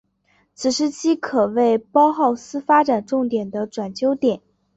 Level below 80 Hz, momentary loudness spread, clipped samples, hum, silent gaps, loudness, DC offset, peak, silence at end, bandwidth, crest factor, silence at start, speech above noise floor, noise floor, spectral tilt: -64 dBFS; 10 LU; under 0.1%; none; none; -20 LUFS; under 0.1%; -4 dBFS; 0.4 s; 8.2 kHz; 16 dB; 0.6 s; 44 dB; -63 dBFS; -4.5 dB/octave